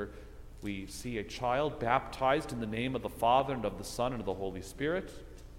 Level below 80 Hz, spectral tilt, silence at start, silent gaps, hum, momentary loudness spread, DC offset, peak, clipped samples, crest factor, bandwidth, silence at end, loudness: -50 dBFS; -5 dB/octave; 0 s; none; none; 15 LU; under 0.1%; -12 dBFS; under 0.1%; 22 dB; 16.5 kHz; 0 s; -33 LUFS